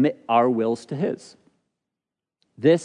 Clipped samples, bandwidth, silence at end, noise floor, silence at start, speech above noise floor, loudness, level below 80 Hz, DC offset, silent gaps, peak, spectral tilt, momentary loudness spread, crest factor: under 0.1%; 10.5 kHz; 0 s; -87 dBFS; 0 s; 65 dB; -23 LUFS; -78 dBFS; under 0.1%; none; -6 dBFS; -7 dB/octave; 8 LU; 18 dB